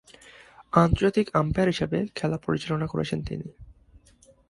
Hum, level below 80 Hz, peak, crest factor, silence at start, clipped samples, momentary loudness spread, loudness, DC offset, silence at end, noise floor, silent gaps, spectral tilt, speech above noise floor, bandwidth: none; -42 dBFS; -4 dBFS; 24 dB; 0.6 s; under 0.1%; 10 LU; -25 LUFS; under 0.1%; 0.75 s; -58 dBFS; none; -7 dB/octave; 33 dB; 11.5 kHz